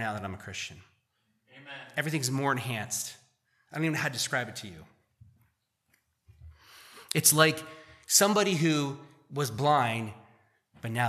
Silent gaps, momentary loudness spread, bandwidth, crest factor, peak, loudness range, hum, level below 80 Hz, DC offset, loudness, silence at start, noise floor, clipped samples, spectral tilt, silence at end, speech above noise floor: none; 20 LU; 15 kHz; 26 dB; -6 dBFS; 10 LU; none; -68 dBFS; under 0.1%; -28 LUFS; 0 s; -75 dBFS; under 0.1%; -3 dB/octave; 0 s; 46 dB